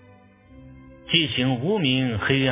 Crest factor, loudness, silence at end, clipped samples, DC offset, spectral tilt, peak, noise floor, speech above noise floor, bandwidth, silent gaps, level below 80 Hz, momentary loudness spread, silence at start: 20 dB; -22 LUFS; 0 s; under 0.1%; under 0.1%; -9.5 dB/octave; -4 dBFS; -51 dBFS; 30 dB; 3.8 kHz; none; -50 dBFS; 3 LU; 0.55 s